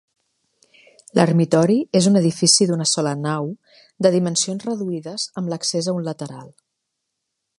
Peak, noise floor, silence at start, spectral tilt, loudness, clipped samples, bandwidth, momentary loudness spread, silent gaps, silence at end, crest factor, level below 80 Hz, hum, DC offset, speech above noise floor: 0 dBFS; -78 dBFS; 1.15 s; -4.5 dB/octave; -19 LUFS; under 0.1%; 11.5 kHz; 13 LU; none; 1.1 s; 20 dB; -66 dBFS; none; under 0.1%; 59 dB